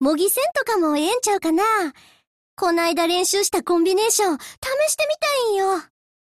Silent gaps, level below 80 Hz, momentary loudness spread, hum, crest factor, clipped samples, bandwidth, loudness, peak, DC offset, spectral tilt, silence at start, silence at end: 2.27-2.57 s, 4.58-4.62 s; -60 dBFS; 5 LU; none; 14 dB; under 0.1%; 13.5 kHz; -20 LUFS; -6 dBFS; under 0.1%; -1 dB/octave; 0 s; 0.4 s